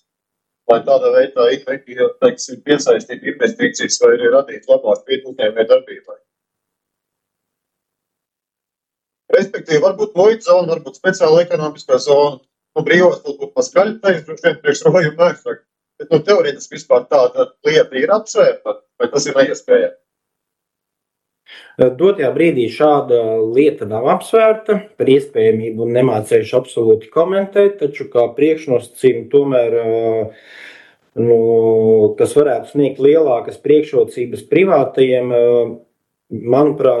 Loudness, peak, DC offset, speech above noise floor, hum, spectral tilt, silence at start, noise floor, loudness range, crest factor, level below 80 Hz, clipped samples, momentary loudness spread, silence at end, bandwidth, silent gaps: -14 LUFS; 0 dBFS; under 0.1%; 70 dB; none; -5 dB/octave; 0.7 s; -84 dBFS; 4 LU; 14 dB; -64 dBFS; under 0.1%; 8 LU; 0 s; 12 kHz; none